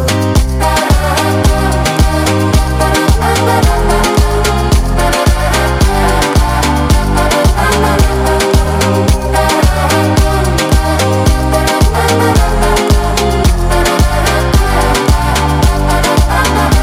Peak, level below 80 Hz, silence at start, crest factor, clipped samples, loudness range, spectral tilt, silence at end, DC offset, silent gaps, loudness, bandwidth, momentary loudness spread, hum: 0 dBFS; -14 dBFS; 0 s; 10 dB; under 0.1%; 0 LU; -5 dB/octave; 0 s; under 0.1%; none; -11 LUFS; 16.5 kHz; 2 LU; none